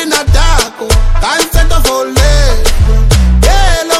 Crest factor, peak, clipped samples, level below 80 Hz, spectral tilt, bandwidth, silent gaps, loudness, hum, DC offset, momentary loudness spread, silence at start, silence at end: 8 dB; 0 dBFS; 0.1%; -8 dBFS; -4 dB/octave; 16 kHz; none; -10 LUFS; none; under 0.1%; 3 LU; 0 s; 0 s